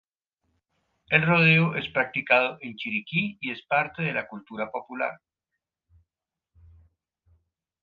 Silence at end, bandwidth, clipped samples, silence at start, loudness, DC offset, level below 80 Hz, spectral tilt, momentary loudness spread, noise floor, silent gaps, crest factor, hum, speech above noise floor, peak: 2.7 s; 5 kHz; under 0.1%; 1.1 s; -24 LUFS; under 0.1%; -64 dBFS; -8 dB/octave; 15 LU; -89 dBFS; none; 24 dB; none; 63 dB; -4 dBFS